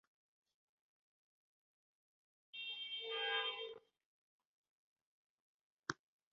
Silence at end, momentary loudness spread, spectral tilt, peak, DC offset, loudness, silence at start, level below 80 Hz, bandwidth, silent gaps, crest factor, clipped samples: 0.4 s; 16 LU; 1.5 dB/octave; -20 dBFS; under 0.1%; -43 LUFS; 2.55 s; under -90 dBFS; 6.8 kHz; 4.06-4.39 s, 4.45-5.79 s; 30 dB; under 0.1%